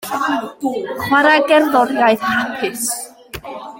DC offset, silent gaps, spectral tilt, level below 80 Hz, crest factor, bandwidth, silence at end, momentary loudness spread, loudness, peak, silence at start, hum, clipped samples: under 0.1%; none; -3 dB/octave; -52 dBFS; 16 dB; 17 kHz; 0 s; 17 LU; -16 LUFS; -2 dBFS; 0 s; none; under 0.1%